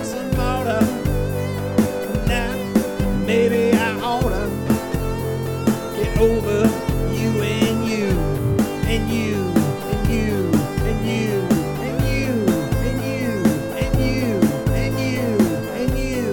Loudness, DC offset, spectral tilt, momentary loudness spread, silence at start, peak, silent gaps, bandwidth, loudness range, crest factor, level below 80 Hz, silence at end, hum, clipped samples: -20 LUFS; under 0.1%; -6.5 dB/octave; 5 LU; 0 s; -2 dBFS; none; 19 kHz; 1 LU; 18 dB; -30 dBFS; 0 s; none; under 0.1%